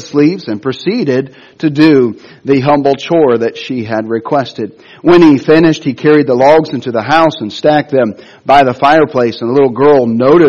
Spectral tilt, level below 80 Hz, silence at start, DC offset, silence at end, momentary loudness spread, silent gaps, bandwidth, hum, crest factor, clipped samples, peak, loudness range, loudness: -7 dB/octave; -48 dBFS; 0 s; under 0.1%; 0 s; 10 LU; none; 7.2 kHz; none; 10 dB; 0.5%; 0 dBFS; 3 LU; -10 LUFS